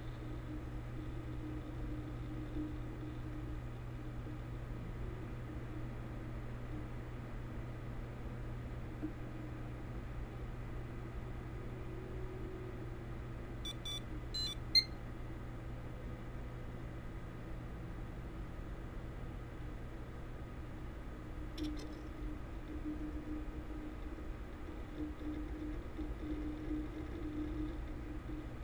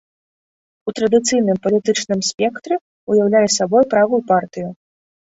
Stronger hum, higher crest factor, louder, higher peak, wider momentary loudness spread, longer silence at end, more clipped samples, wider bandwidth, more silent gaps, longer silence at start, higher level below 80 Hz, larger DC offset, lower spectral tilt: neither; first, 24 dB vs 16 dB; second, -45 LUFS vs -17 LUFS; second, -18 dBFS vs -2 dBFS; second, 5 LU vs 13 LU; second, 0 s vs 0.65 s; neither; first, over 20 kHz vs 8 kHz; second, none vs 2.34-2.38 s, 2.81-3.07 s; second, 0 s vs 0.85 s; first, -48 dBFS vs -60 dBFS; neither; first, -5.5 dB/octave vs -4 dB/octave